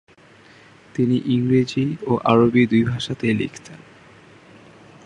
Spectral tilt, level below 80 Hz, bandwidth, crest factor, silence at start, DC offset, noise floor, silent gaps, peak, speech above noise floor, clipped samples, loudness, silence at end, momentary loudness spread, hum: -7 dB/octave; -56 dBFS; 9.8 kHz; 20 dB; 0.95 s; under 0.1%; -49 dBFS; none; 0 dBFS; 30 dB; under 0.1%; -19 LUFS; 1.3 s; 9 LU; none